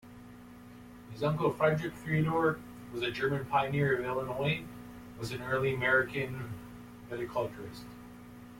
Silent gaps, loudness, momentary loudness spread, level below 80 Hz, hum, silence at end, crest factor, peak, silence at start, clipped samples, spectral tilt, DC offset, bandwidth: none; -32 LUFS; 22 LU; -60 dBFS; none; 0 s; 18 dB; -16 dBFS; 0.05 s; under 0.1%; -6.5 dB/octave; under 0.1%; 16.5 kHz